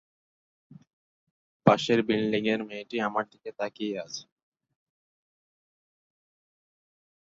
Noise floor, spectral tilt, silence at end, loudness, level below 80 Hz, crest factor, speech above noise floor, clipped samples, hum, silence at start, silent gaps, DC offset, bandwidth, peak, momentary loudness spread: under -90 dBFS; -5.5 dB/octave; 3.05 s; -28 LUFS; -72 dBFS; 28 dB; over 62 dB; under 0.1%; none; 0.7 s; 0.93-1.60 s; under 0.1%; 7.8 kHz; -4 dBFS; 13 LU